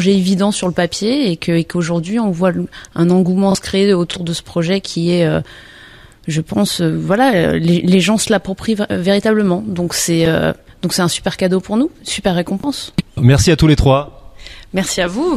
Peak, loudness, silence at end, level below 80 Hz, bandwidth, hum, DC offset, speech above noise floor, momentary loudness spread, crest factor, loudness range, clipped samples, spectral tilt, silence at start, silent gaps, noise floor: 0 dBFS; -15 LUFS; 0 s; -34 dBFS; 15 kHz; none; under 0.1%; 26 dB; 8 LU; 14 dB; 3 LU; under 0.1%; -5.5 dB/octave; 0 s; none; -40 dBFS